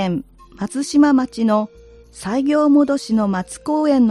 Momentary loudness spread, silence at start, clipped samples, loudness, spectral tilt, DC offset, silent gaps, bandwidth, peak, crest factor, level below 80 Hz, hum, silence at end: 13 LU; 0 s; under 0.1%; -18 LUFS; -6 dB/octave; under 0.1%; none; 11.5 kHz; -4 dBFS; 14 dB; -50 dBFS; none; 0 s